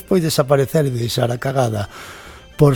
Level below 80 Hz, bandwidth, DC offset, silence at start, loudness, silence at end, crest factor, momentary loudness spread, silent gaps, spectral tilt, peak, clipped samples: -44 dBFS; 17.5 kHz; under 0.1%; 0.1 s; -18 LUFS; 0 s; 18 dB; 19 LU; none; -6 dB/octave; 0 dBFS; under 0.1%